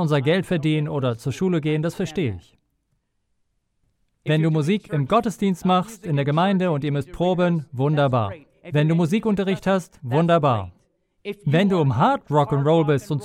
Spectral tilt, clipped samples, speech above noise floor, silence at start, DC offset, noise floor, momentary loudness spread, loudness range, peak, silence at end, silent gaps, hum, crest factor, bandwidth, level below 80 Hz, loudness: -7.5 dB/octave; under 0.1%; 51 dB; 0 s; under 0.1%; -71 dBFS; 7 LU; 5 LU; -6 dBFS; 0 s; none; none; 16 dB; 13.5 kHz; -52 dBFS; -21 LUFS